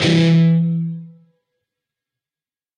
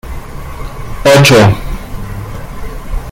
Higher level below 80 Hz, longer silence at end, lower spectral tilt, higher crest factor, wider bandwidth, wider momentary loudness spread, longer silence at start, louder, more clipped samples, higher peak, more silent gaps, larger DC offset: second, -62 dBFS vs -24 dBFS; first, 1.7 s vs 0 s; first, -7 dB/octave vs -5 dB/octave; about the same, 14 dB vs 12 dB; second, 9.4 kHz vs 17 kHz; second, 15 LU vs 22 LU; about the same, 0 s vs 0.05 s; second, -16 LUFS vs -7 LUFS; second, under 0.1% vs 0.1%; second, -4 dBFS vs 0 dBFS; neither; neither